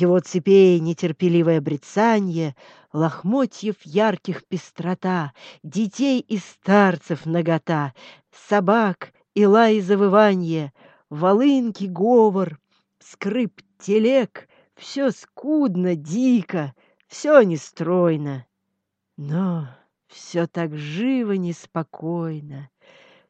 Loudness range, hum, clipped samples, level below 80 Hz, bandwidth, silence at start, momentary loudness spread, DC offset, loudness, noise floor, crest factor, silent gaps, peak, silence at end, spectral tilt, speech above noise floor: 7 LU; none; under 0.1%; -72 dBFS; 8.4 kHz; 0 s; 15 LU; under 0.1%; -20 LUFS; -77 dBFS; 20 dB; none; -2 dBFS; 0.65 s; -7 dB/octave; 57 dB